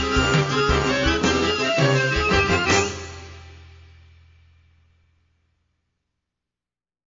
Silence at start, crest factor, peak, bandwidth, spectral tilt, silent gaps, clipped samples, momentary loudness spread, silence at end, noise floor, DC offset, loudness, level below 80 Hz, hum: 0 s; 20 dB; -4 dBFS; 7.6 kHz; -4.5 dB/octave; none; under 0.1%; 14 LU; 3.45 s; under -90 dBFS; under 0.1%; -19 LUFS; -36 dBFS; 60 Hz at -55 dBFS